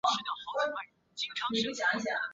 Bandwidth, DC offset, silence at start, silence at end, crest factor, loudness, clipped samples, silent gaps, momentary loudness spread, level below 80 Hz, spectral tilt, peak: 8 kHz; under 0.1%; 0.05 s; 0 s; 20 dB; -33 LUFS; under 0.1%; none; 9 LU; -74 dBFS; 0 dB/octave; -14 dBFS